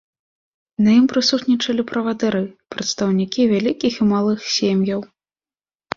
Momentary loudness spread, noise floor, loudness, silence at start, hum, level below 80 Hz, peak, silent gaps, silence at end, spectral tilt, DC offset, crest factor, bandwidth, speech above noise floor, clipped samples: 10 LU; under -90 dBFS; -19 LUFS; 0.8 s; none; -58 dBFS; -2 dBFS; none; 0.95 s; -5 dB/octave; under 0.1%; 18 dB; 7.6 kHz; over 72 dB; under 0.1%